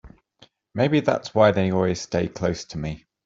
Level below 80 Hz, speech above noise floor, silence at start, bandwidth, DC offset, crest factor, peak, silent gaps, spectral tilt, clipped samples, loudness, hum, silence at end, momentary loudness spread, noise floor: -50 dBFS; 35 dB; 0.05 s; 7.8 kHz; under 0.1%; 20 dB; -4 dBFS; none; -6 dB/octave; under 0.1%; -23 LUFS; none; 0.3 s; 13 LU; -57 dBFS